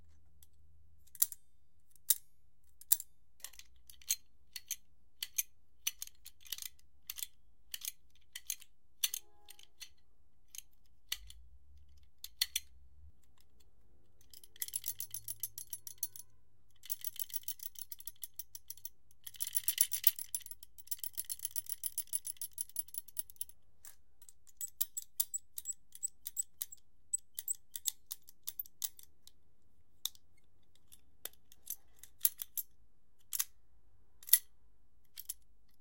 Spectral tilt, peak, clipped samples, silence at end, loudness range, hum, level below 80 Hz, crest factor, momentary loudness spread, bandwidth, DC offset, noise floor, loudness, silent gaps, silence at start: 2.5 dB/octave; -2 dBFS; under 0.1%; 0.45 s; 9 LU; none; -72 dBFS; 40 dB; 20 LU; 17 kHz; 0.2%; -75 dBFS; -38 LUFS; none; 1.2 s